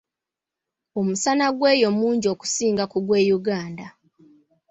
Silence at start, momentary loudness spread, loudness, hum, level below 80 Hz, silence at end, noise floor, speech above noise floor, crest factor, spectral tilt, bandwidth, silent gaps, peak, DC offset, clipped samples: 0.95 s; 10 LU; -21 LUFS; none; -64 dBFS; 0.8 s; -87 dBFS; 66 dB; 18 dB; -4 dB/octave; 8.4 kHz; none; -4 dBFS; under 0.1%; under 0.1%